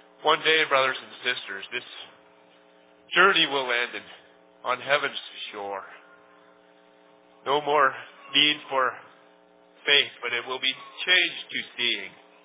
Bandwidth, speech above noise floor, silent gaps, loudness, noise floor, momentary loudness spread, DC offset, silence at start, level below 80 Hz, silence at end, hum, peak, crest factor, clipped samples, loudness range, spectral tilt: 4 kHz; 31 dB; none; -24 LUFS; -57 dBFS; 16 LU; under 0.1%; 0.2 s; -84 dBFS; 0.35 s; none; -6 dBFS; 22 dB; under 0.1%; 7 LU; 1.5 dB/octave